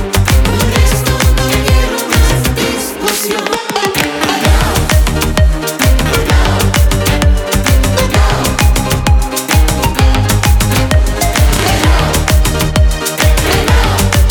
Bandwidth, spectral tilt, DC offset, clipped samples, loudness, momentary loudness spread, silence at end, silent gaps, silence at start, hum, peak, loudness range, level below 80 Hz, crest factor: over 20 kHz; -4.5 dB/octave; under 0.1%; under 0.1%; -11 LUFS; 3 LU; 0 s; none; 0 s; none; 0 dBFS; 1 LU; -14 dBFS; 10 dB